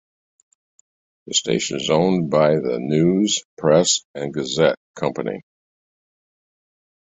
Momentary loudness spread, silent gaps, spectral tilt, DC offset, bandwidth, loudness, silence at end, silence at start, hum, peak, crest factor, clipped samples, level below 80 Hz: 10 LU; 3.45-3.57 s, 4.05-4.14 s, 4.77-4.94 s; -4 dB/octave; under 0.1%; 8.4 kHz; -19 LUFS; 1.65 s; 1.25 s; none; -2 dBFS; 20 dB; under 0.1%; -58 dBFS